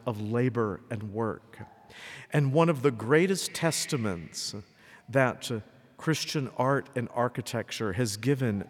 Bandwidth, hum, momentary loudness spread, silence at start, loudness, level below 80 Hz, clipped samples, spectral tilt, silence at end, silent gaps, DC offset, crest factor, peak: 17 kHz; none; 14 LU; 0.05 s; -29 LUFS; -68 dBFS; under 0.1%; -5 dB/octave; 0 s; none; under 0.1%; 20 dB; -10 dBFS